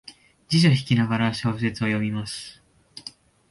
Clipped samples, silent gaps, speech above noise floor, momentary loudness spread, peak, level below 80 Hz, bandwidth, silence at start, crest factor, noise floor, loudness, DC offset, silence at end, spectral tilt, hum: under 0.1%; none; 23 dB; 21 LU; -6 dBFS; -56 dBFS; 11.5 kHz; 0.1 s; 18 dB; -46 dBFS; -23 LUFS; under 0.1%; 0.4 s; -6 dB/octave; none